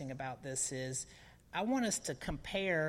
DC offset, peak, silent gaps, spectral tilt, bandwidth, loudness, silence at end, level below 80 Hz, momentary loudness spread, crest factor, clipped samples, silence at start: under 0.1%; -22 dBFS; none; -3.5 dB/octave; 16 kHz; -38 LUFS; 0 s; -58 dBFS; 9 LU; 16 dB; under 0.1%; 0 s